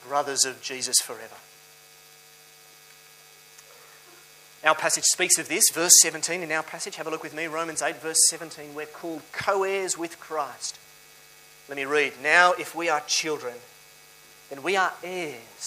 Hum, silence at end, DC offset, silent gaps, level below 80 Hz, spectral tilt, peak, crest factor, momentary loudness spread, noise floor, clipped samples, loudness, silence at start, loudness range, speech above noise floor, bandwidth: none; 0 s; under 0.1%; none; -74 dBFS; 0 dB/octave; 0 dBFS; 26 dB; 18 LU; -52 dBFS; under 0.1%; -23 LUFS; 0 s; 10 LU; 26 dB; 15.5 kHz